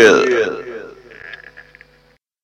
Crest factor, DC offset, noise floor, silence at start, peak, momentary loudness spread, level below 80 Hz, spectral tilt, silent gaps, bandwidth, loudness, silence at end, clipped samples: 18 dB; under 0.1%; -55 dBFS; 0 s; 0 dBFS; 24 LU; -56 dBFS; -3.5 dB/octave; none; 11 kHz; -15 LUFS; 1.1 s; under 0.1%